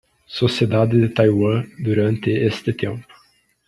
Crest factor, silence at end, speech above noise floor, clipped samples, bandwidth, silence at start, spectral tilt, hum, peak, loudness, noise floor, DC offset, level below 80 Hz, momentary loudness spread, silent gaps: 16 dB; 0.65 s; 40 dB; under 0.1%; 11 kHz; 0.3 s; -7.5 dB/octave; none; -2 dBFS; -19 LUFS; -58 dBFS; under 0.1%; -54 dBFS; 10 LU; none